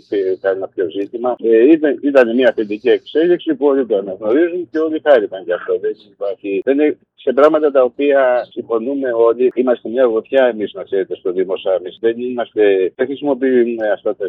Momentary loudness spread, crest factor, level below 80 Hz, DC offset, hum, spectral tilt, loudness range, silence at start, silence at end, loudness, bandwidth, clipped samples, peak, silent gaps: 9 LU; 14 dB; -72 dBFS; under 0.1%; none; -7 dB/octave; 3 LU; 0.1 s; 0 s; -16 LUFS; 5.6 kHz; under 0.1%; 0 dBFS; none